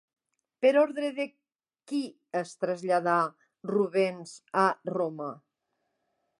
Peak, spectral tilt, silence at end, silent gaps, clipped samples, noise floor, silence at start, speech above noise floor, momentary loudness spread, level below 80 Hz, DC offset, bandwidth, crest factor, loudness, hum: -10 dBFS; -5.5 dB/octave; 1 s; none; under 0.1%; -80 dBFS; 0.6 s; 52 dB; 12 LU; -86 dBFS; under 0.1%; 11.5 kHz; 20 dB; -29 LUFS; none